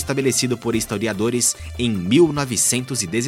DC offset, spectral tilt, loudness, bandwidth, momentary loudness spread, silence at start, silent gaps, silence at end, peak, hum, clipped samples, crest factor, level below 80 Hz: under 0.1%; -4 dB/octave; -19 LUFS; 16.5 kHz; 7 LU; 0 s; none; 0 s; -4 dBFS; none; under 0.1%; 16 dB; -44 dBFS